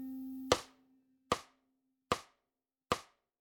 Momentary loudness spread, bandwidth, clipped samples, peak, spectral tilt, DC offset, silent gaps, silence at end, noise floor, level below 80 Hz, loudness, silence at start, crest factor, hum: 10 LU; 18 kHz; under 0.1%; -12 dBFS; -3 dB/octave; under 0.1%; none; 0.35 s; under -90 dBFS; -64 dBFS; -38 LUFS; 0 s; 30 dB; none